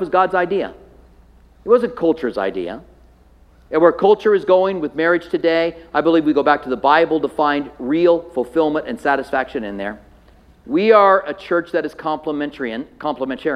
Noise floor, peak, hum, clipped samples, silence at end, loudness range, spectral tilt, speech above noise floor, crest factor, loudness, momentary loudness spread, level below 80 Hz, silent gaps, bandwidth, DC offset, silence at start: -49 dBFS; 0 dBFS; none; under 0.1%; 0 s; 4 LU; -7 dB/octave; 32 dB; 18 dB; -18 LUFS; 12 LU; -50 dBFS; none; 10 kHz; under 0.1%; 0 s